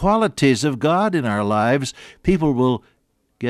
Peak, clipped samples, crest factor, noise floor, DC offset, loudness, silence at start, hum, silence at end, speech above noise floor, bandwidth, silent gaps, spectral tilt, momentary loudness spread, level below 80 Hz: -6 dBFS; under 0.1%; 14 dB; -54 dBFS; under 0.1%; -19 LUFS; 0 s; none; 0 s; 36 dB; 14 kHz; none; -6 dB/octave; 6 LU; -42 dBFS